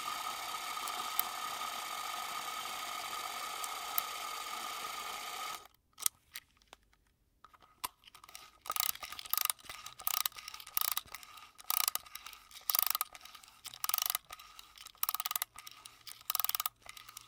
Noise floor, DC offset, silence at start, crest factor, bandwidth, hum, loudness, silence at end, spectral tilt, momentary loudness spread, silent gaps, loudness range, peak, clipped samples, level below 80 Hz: -73 dBFS; under 0.1%; 0 s; 34 dB; 19 kHz; none; -36 LUFS; 0 s; 2 dB/octave; 18 LU; none; 7 LU; -6 dBFS; under 0.1%; -74 dBFS